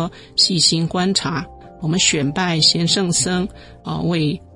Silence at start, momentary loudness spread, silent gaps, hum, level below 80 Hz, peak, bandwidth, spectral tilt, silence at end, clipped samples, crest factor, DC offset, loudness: 0 s; 15 LU; none; none; -46 dBFS; -2 dBFS; 11.5 kHz; -3.5 dB/octave; 0.15 s; under 0.1%; 18 dB; under 0.1%; -17 LUFS